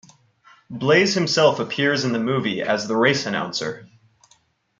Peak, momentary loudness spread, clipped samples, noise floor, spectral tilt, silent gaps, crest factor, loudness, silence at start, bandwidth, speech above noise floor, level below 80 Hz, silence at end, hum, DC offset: -4 dBFS; 10 LU; under 0.1%; -61 dBFS; -4.5 dB/octave; none; 18 dB; -20 LUFS; 0.7 s; 9.2 kHz; 40 dB; -66 dBFS; 0.95 s; none; under 0.1%